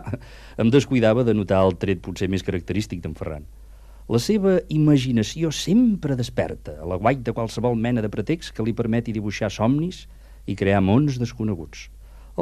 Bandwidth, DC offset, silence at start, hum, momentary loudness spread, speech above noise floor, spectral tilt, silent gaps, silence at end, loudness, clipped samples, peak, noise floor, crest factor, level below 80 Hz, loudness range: 13.5 kHz; under 0.1%; 0 s; none; 15 LU; 21 dB; -6.5 dB/octave; none; 0 s; -22 LUFS; under 0.1%; -4 dBFS; -43 dBFS; 18 dB; -42 dBFS; 3 LU